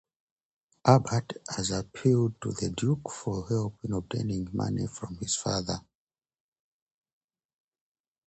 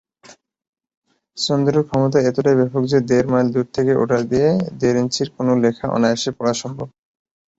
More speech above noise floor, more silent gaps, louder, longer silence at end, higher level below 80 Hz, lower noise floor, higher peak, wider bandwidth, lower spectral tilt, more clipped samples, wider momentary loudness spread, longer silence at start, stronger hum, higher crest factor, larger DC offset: first, over 61 dB vs 31 dB; second, none vs 0.69-0.73 s, 0.97-1.02 s; second, -29 LUFS vs -18 LUFS; first, 2.5 s vs 0.7 s; about the same, -54 dBFS vs -52 dBFS; first, under -90 dBFS vs -48 dBFS; about the same, -4 dBFS vs -2 dBFS; first, 9 kHz vs 8 kHz; about the same, -5.5 dB/octave vs -6 dB/octave; neither; first, 11 LU vs 6 LU; first, 0.85 s vs 0.3 s; neither; first, 26 dB vs 16 dB; neither